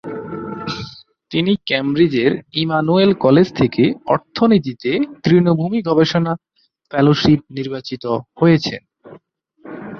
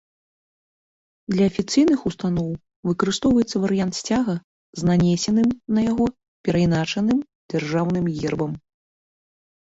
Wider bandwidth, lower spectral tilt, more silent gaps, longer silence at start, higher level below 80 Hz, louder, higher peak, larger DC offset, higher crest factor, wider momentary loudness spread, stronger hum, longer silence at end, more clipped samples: second, 6.6 kHz vs 8 kHz; first, -7.5 dB/octave vs -6 dB/octave; second, none vs 2.76-2.83 s, 4.44-4.73 s, 6.28-6.44 s, 7.35-7.49 s; second, 0.05 s vs 1.3 s; about the same, -50 dBFS vs -48 dBFS; first, -17 LUFS vs -22 LUFS; first, -2 dBFS vs -6 dBFS; neither; about the same, 16 dB vs 16 dB; first, 14 LU vs 10 LU; neither; second, 0 s vs 1.15 s; neither